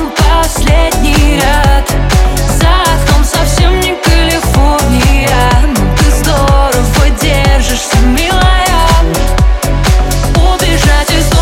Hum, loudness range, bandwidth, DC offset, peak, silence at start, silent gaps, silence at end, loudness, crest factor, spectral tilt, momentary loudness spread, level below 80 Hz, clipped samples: none; 1 LU; 16.5 kHz; under 0.1%; 0 dBFS; 0 s; none; 0 s; -9 LUFS; 8 dB; -4.5 dB/octave; 2 LU; -10 dBFS; under 0.1%